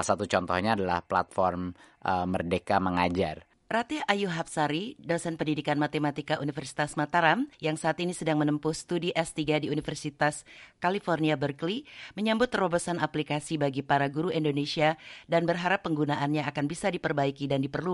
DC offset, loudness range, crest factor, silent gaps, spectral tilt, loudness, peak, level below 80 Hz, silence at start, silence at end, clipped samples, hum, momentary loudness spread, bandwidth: under 0.1%; 2 LU; 22 dB; none; -5.5 dB/octave; -29 LUFS; -6 dBFS; -60 dBFS; 0 s; 0 s; under 0.1%; none; 6 LU; 11.5 kHz